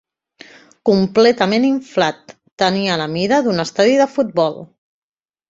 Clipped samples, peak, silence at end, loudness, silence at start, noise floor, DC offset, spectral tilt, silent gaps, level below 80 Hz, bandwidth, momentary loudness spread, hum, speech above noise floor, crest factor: under 0.1%; 0 dBFS; 0.85 s; -16 LUFS; 0.85 s; -45 dBFS; under 0.1%; -5.5 dB/octave; 2.52-2.57 s; -58 dBFS; 8 kHz; 7 LU; none; 29 dB; 16 dB